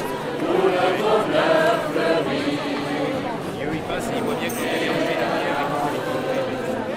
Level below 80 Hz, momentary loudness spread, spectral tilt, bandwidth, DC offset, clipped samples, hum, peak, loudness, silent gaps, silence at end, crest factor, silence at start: -52 dBFS; 7 LU; -5 dB/octave; 16 kHz; under 0.1%; under 0.1%; none; -6 dBFS; -22 LUFS; none; 0 s; 16 dB; 0 s